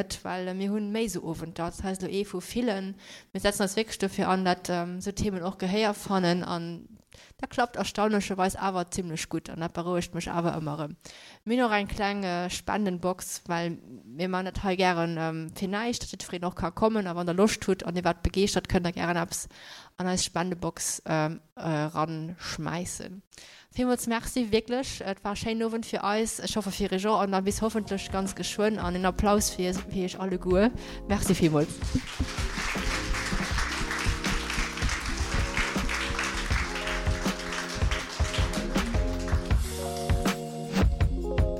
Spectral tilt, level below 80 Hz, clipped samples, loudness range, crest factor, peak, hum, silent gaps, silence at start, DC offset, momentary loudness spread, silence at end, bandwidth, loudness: -4.5 dB/octave; -38 dBFS; under 0.1%; 3 LU; 18 dB; -10 dBFS; none; 21.52-21.56 s, 23.27-23.31 s; 0 s; under 0.1%; 9 LU; 0 s; 16.5 kHz; -29 LUFS